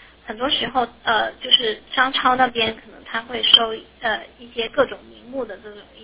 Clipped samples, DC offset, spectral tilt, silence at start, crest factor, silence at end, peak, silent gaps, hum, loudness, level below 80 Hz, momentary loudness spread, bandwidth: under 0.1%; under 0.1%; -6.5 dB/octave; 0.25 s; 22 dB; 0 s; 0 dBFS; none; none; -19 LUFS; -54 dBFS; 19 LU; 4 kHz